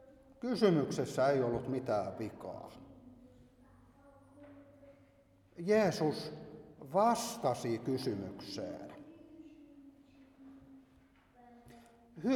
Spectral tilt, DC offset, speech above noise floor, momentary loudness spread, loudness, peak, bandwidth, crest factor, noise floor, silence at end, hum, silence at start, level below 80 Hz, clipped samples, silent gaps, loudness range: -6 dB/octave; under 0.1%; 32 dB; 26 LU; -35 LUFS; -16 dBFS; 18 kHz; 22 dB; -66 dBFS; 0 s; none; 0 s; -70 dBFS; under 0.1%; none; 17 LU